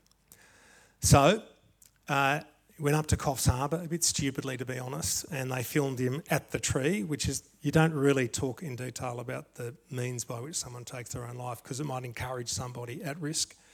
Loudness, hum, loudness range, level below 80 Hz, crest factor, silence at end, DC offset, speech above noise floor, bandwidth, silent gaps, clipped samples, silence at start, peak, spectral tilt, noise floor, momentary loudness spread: -30 LUFS; none; 9 LU; -52 dBFS; 24 dB; 0.25 s; under 0.1%; 32 dB; 19 kHz; none; under 0.1%; 1 s; -8 dBFS; -4.5 dB/octave; -62 dBFS; 13 LU